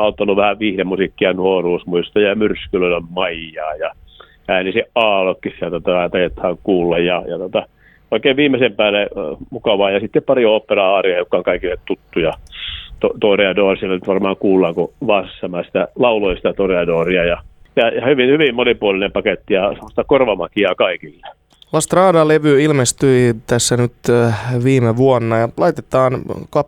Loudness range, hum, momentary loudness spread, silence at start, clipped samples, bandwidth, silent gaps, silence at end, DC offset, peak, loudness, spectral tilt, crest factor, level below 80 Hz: 4 LU; none; 9 LU; 0 s; under 0.1%; 15.5 kHz; none; 0 s; under 0.1%; 0 dBFS; -16 LUFS; -5 dB/octave; 16 dB; -42 dBFS